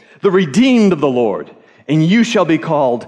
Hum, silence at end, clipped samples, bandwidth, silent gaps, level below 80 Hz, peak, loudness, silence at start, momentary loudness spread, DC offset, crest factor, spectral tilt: none; 0 s; under 0.1%; 10 kHz; none; -58 dBFS; -2 dBFS; -13 LUFS; 0.25 s; 7 LU; under 0.1%; 10 dB; -6.5 dB/octave